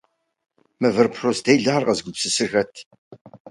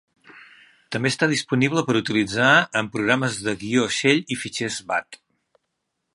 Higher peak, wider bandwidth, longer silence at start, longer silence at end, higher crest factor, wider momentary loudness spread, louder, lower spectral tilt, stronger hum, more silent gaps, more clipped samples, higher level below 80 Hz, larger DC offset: about the same, 0 dBFS vs -2 dBFS; about the same, 11.5 kHz vs 11.5 kHz; first, 0.8 s vs 0.35 s; second, 0 s vs 1 s; about the same, 22 dB vs 22 dB; second, 6 LU vs 10 LU; about the same, -20 LUFS vs -21 LUFS; about the same, -4 dB/octave vs -4 dB/octave; neither; first, 2.86-2.91 s, 2.98-3.11 s, 3.21-3.25 s, 3.40-3.45 s vs none; neither; about the same, -62 dBFS vs -60 dBFS; neither